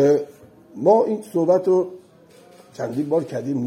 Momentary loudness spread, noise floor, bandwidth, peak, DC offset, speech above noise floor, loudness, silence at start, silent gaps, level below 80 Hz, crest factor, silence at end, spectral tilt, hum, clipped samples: 13 LU; -49 dBFS; 14 kHz; -4 dBFS; under 0.1%; 30 dB; -21 LUFS; 0 s; none; -72 dBFS; 16 dB; 0 s; -8 dB/octave; none; under 0.1%